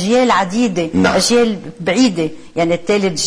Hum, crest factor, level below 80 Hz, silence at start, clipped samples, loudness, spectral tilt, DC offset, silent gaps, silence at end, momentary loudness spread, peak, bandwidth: none; 12 dB; -46 dBFS; 0 s; under 0.1%; -15 LUFS; -4.5 dB/octave; under 0.1%; none; 0 s; 8 LU; -2 dBFS; 11 kHz